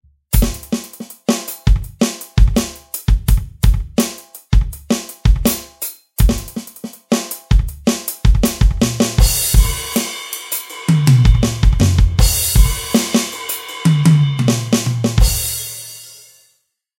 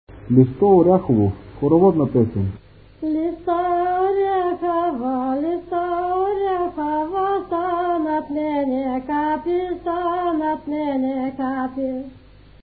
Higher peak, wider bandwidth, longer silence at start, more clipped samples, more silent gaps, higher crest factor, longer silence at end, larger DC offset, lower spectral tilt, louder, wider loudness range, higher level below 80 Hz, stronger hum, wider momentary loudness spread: about the same, 0 dBFS vs -2 dBFS; first, 17 kHz vs 4.7 kHz; first, 0.3 s vs 0.1 s; neither; neither; about the same, 14 dB vs 18 dB; first, 0.9 s vs 0.45 s; neither; second, -5 dB/octave vs -13 dB/octave; first, -16 LUFS vs -20 LUFS; about the same, 4 LU vs 4 LU; first, -18 dBFS vs -46 dBFS; second, none vs 50 Hz at -50 dBFS; about the same, 11 LU vs 9 LU